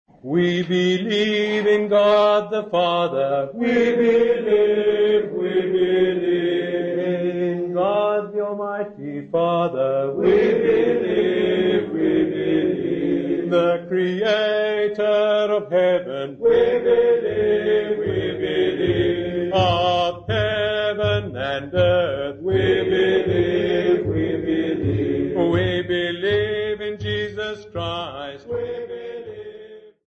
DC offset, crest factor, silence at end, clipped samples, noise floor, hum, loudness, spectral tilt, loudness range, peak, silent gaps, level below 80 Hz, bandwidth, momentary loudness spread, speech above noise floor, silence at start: under 0.1%; 12 dB; 0.2 s; under 0.1%; -42 dBFS; none; -20 LUFS; -7 dB/octave; 4 LU; -8 dBFS; none; -48 dBFS; 7.4 kHz; 9 LU; 23 dB; 0.25 s